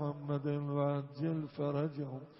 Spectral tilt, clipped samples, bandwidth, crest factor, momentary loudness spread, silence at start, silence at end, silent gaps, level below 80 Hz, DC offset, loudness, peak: -8.5 dB/octave; under 0.1%; 5.6 kHz; 16 dB; 3 LU; 0 s; 0 s; none; -76 dBFS; under 0.1%; -37 LUFS; -22 dBFS